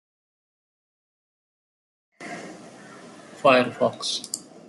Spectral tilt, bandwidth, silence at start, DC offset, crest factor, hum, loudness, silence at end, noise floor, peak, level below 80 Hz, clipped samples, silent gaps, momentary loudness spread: -3 dB/octave; 12 kHz; 2.2 s; under 0.1%; 24 dB; none; -22 LUFS; 0.25 s; -45 dBFS; -4 dBFS; -76 dBFS; under 0.1%; none; 26 LU